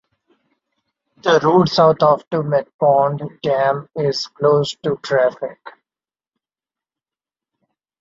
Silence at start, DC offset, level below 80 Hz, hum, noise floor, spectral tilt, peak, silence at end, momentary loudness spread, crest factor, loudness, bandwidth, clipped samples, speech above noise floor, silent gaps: 1.25 s; under 0.1%; -60 dBFS; none; under -90 dBFS; -6 dB/octave; -2 dBFS; 2.3 s; 10 LU; 18 dB; -17 LUFS; 7.8 kHz; under 0.1%; over 74 dB; 2.27-2.31 s, 2.74-2.79 s